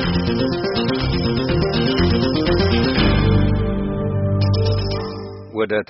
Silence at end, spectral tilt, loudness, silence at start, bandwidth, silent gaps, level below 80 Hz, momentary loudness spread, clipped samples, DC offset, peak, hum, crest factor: 0.05 s; -5.5 dB/octave; -19 LUFS; 0 s; 5.8 kHz; none; -28 dBFS; 7 LU; under 0.1%; under 0.1%; -4 dBFS; none; 14 dB